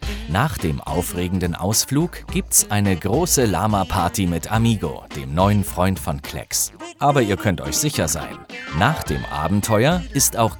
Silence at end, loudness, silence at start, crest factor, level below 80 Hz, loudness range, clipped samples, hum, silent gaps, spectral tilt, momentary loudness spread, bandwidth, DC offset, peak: 0 s; -20 LUFS; 0 s; 20 dB; -36 dBFS; 2 LU; under 0.1%; none; none; -4.5 dB/octave; 9 LU; over 20 kHz; under 0.1%; -2 dBFS